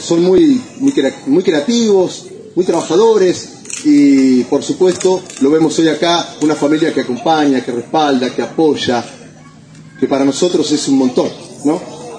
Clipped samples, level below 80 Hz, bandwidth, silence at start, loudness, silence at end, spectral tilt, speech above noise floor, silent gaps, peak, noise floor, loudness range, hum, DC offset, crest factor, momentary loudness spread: under 0.1%; -56 dBFS; 10 kHz; 0 s; -13 LUFS; 0 s; -4.5 dB/octave; 26 dB; none; 0 dBFS; -38 dBFS; 4 LU; none; under 0.1%; 12 dB; 8 LU